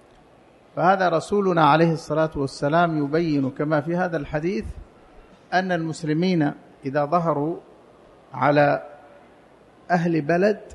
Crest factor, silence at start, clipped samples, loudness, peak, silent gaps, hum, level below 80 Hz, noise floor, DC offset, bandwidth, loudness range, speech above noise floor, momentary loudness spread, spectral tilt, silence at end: 18 dB; 0.75 s; under 0.1%; -22 LUFS; -4 dBFS; none; none; -50 dBFS; -53 dBFS; under 0.1%; 11.5 kHz; 4 LU; 31 dB; 10 LU; -7 dB/octave; 0 s